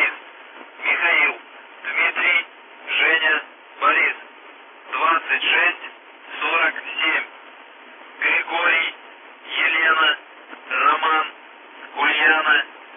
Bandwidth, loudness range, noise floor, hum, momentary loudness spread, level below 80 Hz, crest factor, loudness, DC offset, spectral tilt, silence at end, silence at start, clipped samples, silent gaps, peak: 3.8 kHz; 2 LU; -43 dBFS; none; 19 LU; under -90 dBFS; 16 dB; -18 LUFS; under 0.1%; -1.5 dB/octave; 0 s; 0 s; under 0.1%; none; -6 dBFS